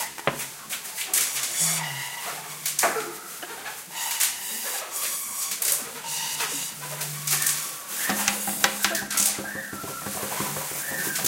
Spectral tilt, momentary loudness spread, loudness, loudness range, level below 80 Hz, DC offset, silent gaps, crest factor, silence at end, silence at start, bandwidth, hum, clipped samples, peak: -0.5 dB/octave; 10 LU; -26 LUFS; 3 LU; -66 dBFS; under 0.1%; none; 28 dB; 0 s; 0 s; 17 kHz; none; under 0.1%; 0 dBFS